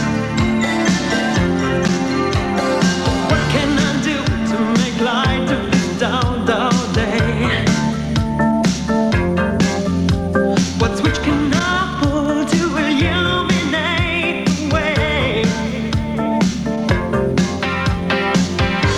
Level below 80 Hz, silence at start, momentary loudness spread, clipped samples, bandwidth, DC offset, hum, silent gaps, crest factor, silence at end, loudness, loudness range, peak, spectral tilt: -30 dBFS; 0 s; 3 LU; under 0.1%; 13 kHz; under 0.1%; none; none; 14 dB; 0 s; -17 LUFS; 1 LU; -2 dBFS; -5.5 dB/octave